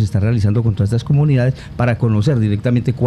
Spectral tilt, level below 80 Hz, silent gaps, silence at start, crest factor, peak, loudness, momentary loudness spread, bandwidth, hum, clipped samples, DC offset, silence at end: -8.5 dB/octave; -38 dBFS; none; 0 s; 10 dB; -4 dBFS; -16 LUFS; 4 LU; 10.5 kHz; none; under 0.1%; under 0.1%; 0 s